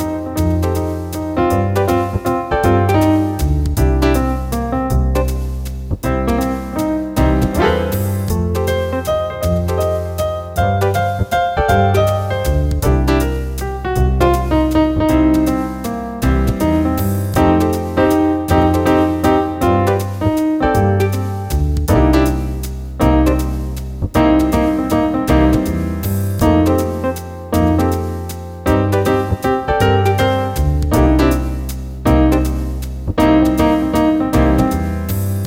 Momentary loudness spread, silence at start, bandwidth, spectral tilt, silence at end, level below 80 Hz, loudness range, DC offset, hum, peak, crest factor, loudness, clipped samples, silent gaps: 8 LU; 0 s; 17 kHz; -7 dB/octave; 0 s; -22 dBFS; 3 LU; under 0.1%; none; -2 dBFS; 12 dB; -16 LUFS; under 0.1%; none